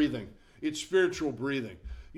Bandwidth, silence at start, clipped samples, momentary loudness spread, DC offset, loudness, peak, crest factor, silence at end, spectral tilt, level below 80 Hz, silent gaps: 13 kHz; 0 s; under 0.1%; 16 LU; under 0.1%; -31 LUFS; -14 dBFS; 18 dB; 0 s; -5 dB/octave; -50 dBFS; none